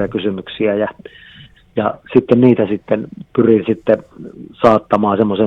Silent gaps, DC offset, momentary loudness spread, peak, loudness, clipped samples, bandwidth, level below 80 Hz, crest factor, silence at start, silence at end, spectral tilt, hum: none; under 0.1%; 11 LU; 0 dBFS; -15 LUFS; under 0.1%; 6.4 kHz; -50 dBFS; 16 dB; 0 s; 0 s; -9 dB/octave; none